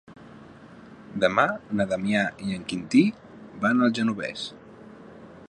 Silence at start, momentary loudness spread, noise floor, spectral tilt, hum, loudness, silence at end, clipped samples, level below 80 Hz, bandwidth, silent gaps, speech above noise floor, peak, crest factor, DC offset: 0.1 s; 24 LU; -47 dBFS; -5.5 dB/octave; none; -25 LUFS; 0.05 s; under 0.1%; -62 dBFS; 10 kHz; none; 23 dB; -4 dBFS; 22 dB; under 0.1%